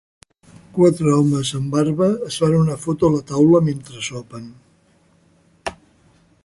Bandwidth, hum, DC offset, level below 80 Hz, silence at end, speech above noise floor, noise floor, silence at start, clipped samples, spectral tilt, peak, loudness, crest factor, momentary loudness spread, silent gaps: 11.5 kHz; none; under 0.1%; -50 dBFS; 0.7 s; 40 dB; -57 dBFS; 0.75 s; under 0.1%; -6.5 dB/octave; -2 dBFS; -18 LUFS; 18 dB; 17 LU; none